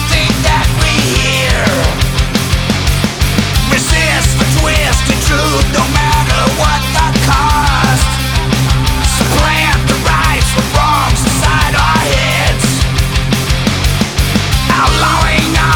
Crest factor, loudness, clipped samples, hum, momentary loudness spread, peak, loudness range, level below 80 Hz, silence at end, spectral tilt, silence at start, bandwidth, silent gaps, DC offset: 10 dB; -11 LUFS; under 0.1%; none; 3 LU; 0 dBFS; 1 LU; -16 dBFS; 0 s; -4 dB/octave; 0 s; 20 kHz; none; under 0.1%